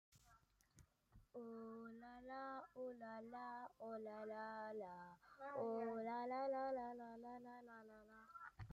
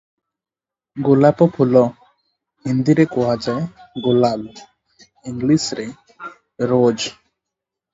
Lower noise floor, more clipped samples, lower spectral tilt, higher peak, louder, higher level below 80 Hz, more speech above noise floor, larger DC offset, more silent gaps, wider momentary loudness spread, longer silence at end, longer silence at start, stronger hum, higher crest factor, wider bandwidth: second, -75 dBFS vs -83 dBFS; neither; about the same, -6.5 dB/octave vs -6.5 dB/octave; second, -36 dBFS vs 0 dBFS; second, -51 LUFS vs -18 LUFS; second, -80 dBFS vs -56 dBFS; second, 25 dB vs 67 dB; neither; neither; second, 14 LU vs 22 LU; second, 0 s vs 0.8 s; second, 0.1 s vs 0.95 s; neither; about the same, 16 dB vs 18 dB; first, 15 kHz vs 7.8 kHz